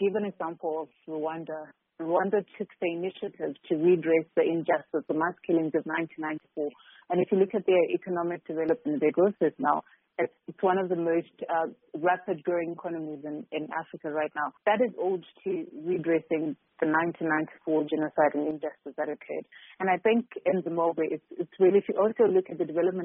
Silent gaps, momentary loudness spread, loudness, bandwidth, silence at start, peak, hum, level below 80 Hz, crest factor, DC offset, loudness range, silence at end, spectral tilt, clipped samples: none; 11 LU; -29 LUFS; 3.8 kHz; 0 s; -10 dBFS; none; -76 dBFS; 18 dB; under 0.1%; 4 LU; 0 s; -2.5 dB/octave; under 0.1%